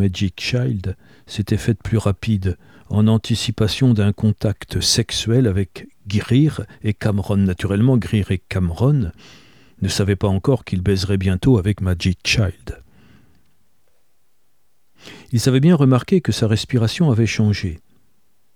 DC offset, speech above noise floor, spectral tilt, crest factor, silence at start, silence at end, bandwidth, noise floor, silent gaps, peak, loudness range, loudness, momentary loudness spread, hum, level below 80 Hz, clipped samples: 0.3%; 50 dB; -6 dB/octave; 16 dB; 0 s; 0.8 s; 15 kHz; -68 dBFS; none; -2 dBFS; 4 LU; -19 LUFS; 10 LU; none; -40 dBFS; under 0.1%